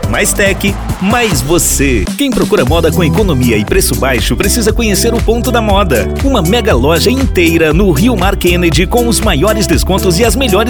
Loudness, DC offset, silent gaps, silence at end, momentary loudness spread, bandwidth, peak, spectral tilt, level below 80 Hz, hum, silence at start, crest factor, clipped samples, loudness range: -10 LUFS; 0.4%; none; 0 s; 3 LU; over 20 kHz; 0 dBFS; -4.5 dB/octave; -18 dBFS; none; 0 s; 10 dB; under 0.1%; 1 LU